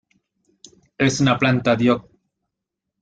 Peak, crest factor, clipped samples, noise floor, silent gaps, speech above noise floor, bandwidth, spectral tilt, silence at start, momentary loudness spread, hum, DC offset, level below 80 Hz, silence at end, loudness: -4 dBFS; 18 dB; under 0.1%; -82 dBFS; none; 64 dB; 9.2 kHz; -5.5 dB/octave; 1 s; 4 LU; none; under 0.1%; -56 dBFS; 1 s; -19 LUFS